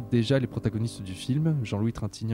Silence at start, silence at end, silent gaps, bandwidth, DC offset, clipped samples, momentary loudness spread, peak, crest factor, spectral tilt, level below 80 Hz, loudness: 0 s; 0 s; none; 12.5 kHz; under 0.1%; under 0.1%; 9 LU; -12 dBFS; 16 dB; -7 dB/octave; -52 dBFS; -28 LUFS